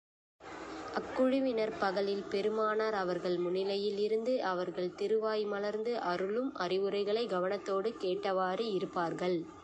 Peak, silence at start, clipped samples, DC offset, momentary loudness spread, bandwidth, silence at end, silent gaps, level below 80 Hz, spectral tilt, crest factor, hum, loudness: -18 dBFS; 0.4 s; under 0.1%; under 0.1%; 4 LU; 8.8 kHz; 0 s; none; -72 dBFS; -6 dB/octave; 16 dB; none; -34 LUFS